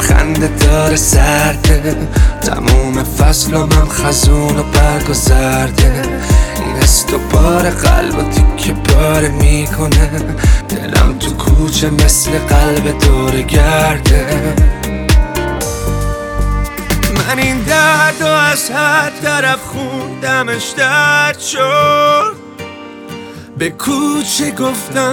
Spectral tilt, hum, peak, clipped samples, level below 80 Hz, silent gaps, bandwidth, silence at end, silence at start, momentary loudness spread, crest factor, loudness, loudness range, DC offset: -4.5 dB/octave; none; 0 dBFS; under 0.1%; -14 dBFS; none; over 20 kHz; 0 s; 0 s; 8 LU; 10 dB; -12 LUFS; 2 LU; under 0.1%